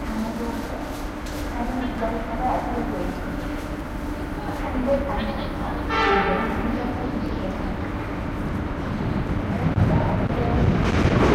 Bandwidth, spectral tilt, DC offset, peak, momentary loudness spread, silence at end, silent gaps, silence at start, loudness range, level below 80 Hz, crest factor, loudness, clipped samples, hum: 16 kHz; -7 dB/octave; under 0.1%; -6 dBFS; 10 LU; 0 s; none; 0 s; 4 LU; -32 dBFS; 18 dB; -25 LUFS; under 0.1%; none